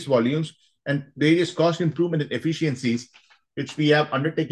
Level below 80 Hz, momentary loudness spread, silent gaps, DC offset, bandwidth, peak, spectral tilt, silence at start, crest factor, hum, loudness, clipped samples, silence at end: -68 dBFS; 12 LU; none; under 0.1%; 10 kHz; -6 dBFS; -6.5 dB/octave; 0 s; 18 dB; none; -23 LUFS; under 0.1%; 0.05 s